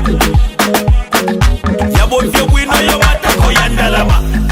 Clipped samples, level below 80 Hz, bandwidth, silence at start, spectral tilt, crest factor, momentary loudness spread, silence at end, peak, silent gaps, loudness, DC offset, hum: under 0.1%; -14 dBFS; 16.5 kHz; 0 s; -4.5 dB/octave; 10 dB; 3 LU; 0 s; 0 dBFS; none; -11 LUFS; under 0.1%; none